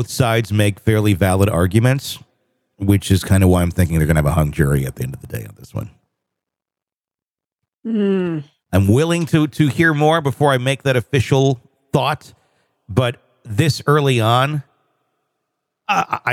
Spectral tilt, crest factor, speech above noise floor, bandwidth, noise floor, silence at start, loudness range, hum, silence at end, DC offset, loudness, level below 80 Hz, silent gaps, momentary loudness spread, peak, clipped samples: -6 dB/octave; 16 dB; over 74 dB; 16.5 kHz; under -90 dBFS; 0 s; 8 LU; none; 0 s; under 0.1%; -17 LUFS; -40 dBFS; 6.96-7.00 s; 14 LU; -2 dBFS; under 0.1%